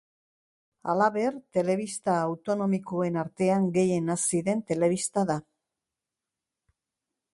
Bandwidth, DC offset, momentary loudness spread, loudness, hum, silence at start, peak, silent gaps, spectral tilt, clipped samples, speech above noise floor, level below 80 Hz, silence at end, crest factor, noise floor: 11.5 kHz; under 0.1%; 5 LU; -27 LUFS; none; 0.85 s; -10 dBFS; none; -5.5 dB/octave; under 0.1%; 62 dB; -70 dBFS; 1.9 s; 18 dB; -88 dBFS